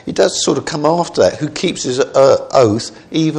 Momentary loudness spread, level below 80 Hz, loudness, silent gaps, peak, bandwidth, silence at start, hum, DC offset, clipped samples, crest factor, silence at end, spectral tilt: 8 LU; -50 dBFS; -14 LUFS; none; 0 dBFS; 11 kHz; 0.05 s; none; under 0.1%; under 0.1%; 14 dB; 0 s; -4.5 dB/octave